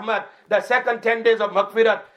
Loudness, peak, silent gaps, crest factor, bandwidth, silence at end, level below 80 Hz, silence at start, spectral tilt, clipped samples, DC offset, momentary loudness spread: -20 LUFS; -4 dBFS; none; 16 dB; 11 kHz; 0.1 s; -80 dBFS; 0 s; -4 dB/octave; under 0.1%; under 0.1%; 5 LU